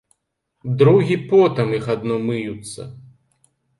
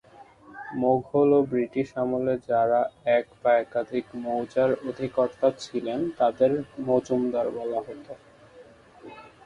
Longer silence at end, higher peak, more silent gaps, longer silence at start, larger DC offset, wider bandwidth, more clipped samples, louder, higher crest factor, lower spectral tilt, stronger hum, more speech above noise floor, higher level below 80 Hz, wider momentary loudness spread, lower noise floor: first, 0.8 s vs 0.2 s; first, -2 dBFS vs -10 dBFS; neither; first, 0.65 s vs 0.2 s; neither; about the same, 11.5 kHz vs 10.5 kHz; neither; first, -18 LUFS vs -25 LUFS; about the same, 18 dB vs 16 dB; about the same, -7.5 dB/octave vs -7 dB/octave; neither; first, 55 dB vs 26 dB; about the same, -58 dBFS vs -62 dBFS; first, 20 LU vs 14 LU; first, -73 dBFS vs -51 dBFS